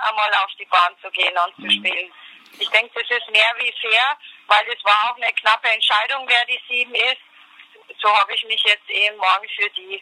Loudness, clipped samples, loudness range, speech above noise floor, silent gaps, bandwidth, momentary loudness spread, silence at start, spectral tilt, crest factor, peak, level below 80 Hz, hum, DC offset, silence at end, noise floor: -18 LUFS; under 0.1%; 2 LU; 28 dB; none; 15 kHz; 6 LU; 0 s; 0 dB/octave; 20 dB; 0 dBFS; under -90 dBFS; none; under 0.1%; 0 s; -47 dBFS